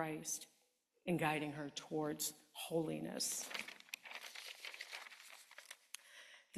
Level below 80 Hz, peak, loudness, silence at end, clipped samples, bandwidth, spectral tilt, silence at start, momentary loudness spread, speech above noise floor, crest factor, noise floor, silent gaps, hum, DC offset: -82 dBFS; -22 dBFS; -44 LUFS; 0 s; under 0.1%; 14 kHz; -3.5 dB/octave; 0 s; 17 LU; 37 dB; 24 dB; -80 dBFS; none; none; under 0.1%